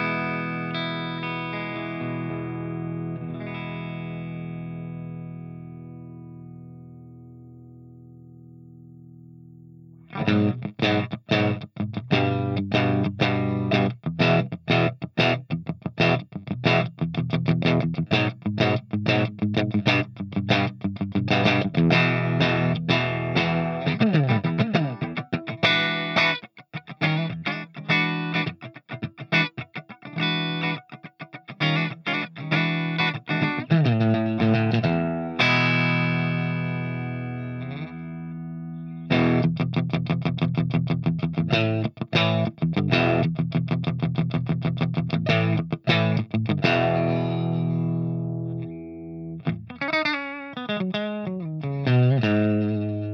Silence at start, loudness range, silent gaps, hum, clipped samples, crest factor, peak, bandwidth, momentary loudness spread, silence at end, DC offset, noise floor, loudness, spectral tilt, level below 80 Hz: 0 s; 9 LU; none; none; under 0.1%; 20 dB; -6 dBFS; 6.6 kHz; 14 LU; 0 s; under 0.1%; -47 dBFS; -24 LUFS; -7.5 dB/octave; -60 dBFS